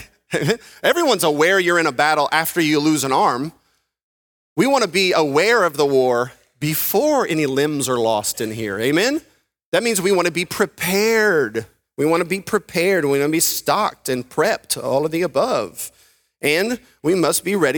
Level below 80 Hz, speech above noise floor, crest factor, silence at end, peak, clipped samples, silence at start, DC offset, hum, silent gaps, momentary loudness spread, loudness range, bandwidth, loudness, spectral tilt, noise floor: -58 dBFS; over 72 dB; 18 dB; 0 s; 0 dBFS; under 0.1%; 0 s; under 0.1%; none; 4.03-4.56 s, 9.65-9.72 s; 8 LU; 3 LU; over 20 kHz; -18 LUFS; -3.5 dB/octave; under -90 dBFS